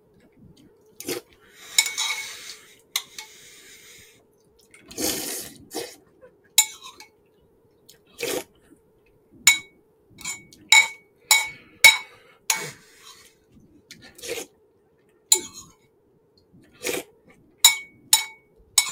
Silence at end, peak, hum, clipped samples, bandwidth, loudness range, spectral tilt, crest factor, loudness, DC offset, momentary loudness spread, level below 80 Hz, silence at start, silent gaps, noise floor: 0 s; 0 dBFS; none; under 0.1%; 17.5 kHz; 13 LU; 1.5 dB/octave; 28 dB; -21 LUFS; under 0.1%; 24 LU; -64 dBFS; 1 s; none; -62 dBFS